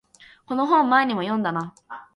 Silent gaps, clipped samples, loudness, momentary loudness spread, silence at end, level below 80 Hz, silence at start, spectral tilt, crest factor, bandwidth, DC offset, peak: none; under 0.1%; -22 LUFS; 16 LU; 0.15 s; -70 dBFS; 0.5 s; -6.5 dB/octave; 18 dB; 11 kHz; under 0.1%; -6 dBFS